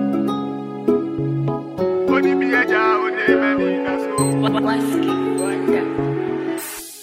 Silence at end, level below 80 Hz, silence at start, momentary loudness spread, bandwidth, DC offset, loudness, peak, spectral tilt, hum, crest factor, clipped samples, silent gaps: 0 s; -54 dBFS; 0 s; 8 LU; 16 kHz; under 0.1%; -19 LUFS; -2 dBFS; -5.5 dB/octave; none; 16 dB; under 0.1%; none